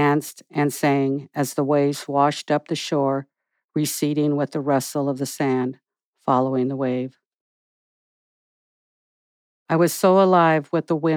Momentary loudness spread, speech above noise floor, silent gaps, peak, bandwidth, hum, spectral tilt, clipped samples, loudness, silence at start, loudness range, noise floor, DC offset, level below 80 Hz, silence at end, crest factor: 9 LU; over 69 dB; 3.64-3.69 s, 6.05-6.13 s, 7.27-9.66 s; -4 dBFS; 20 kHz; none; -5.5 dB/octave; under 0.1%; -21 LUFS; 0 s; 6 LU; under -90 dBFS; under 0.1%; -84 dBFS; 0 s; 18 dB